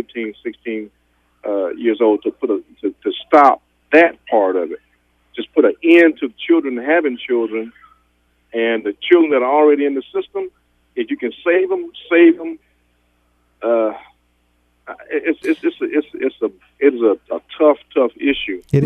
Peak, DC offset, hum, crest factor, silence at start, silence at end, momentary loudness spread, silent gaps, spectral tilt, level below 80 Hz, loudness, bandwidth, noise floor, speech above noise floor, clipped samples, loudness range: 0 dBFS; under 0.1%; 60 Hz at -55 dBFS; 18 dB; 0.15 s; 0 s; 16 LU; none; -8 dB/octave; -58 dBFS; -17 LUFS; 5.2 kHz; -61 dBFS; 45 dB; under 0.1%; 6 LU